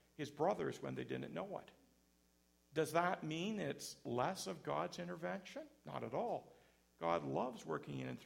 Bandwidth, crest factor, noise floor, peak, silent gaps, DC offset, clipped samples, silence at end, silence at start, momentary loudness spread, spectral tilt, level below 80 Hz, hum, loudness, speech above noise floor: 16 kHz; 24 dB; -75 dBFS; -20 dBFS; none; under 0.1%; under 0.1%; 0 s; 0.2 s; 10 LU; -5 dB/octave; -78 dBFS; none; -43 LUFS; 33 dB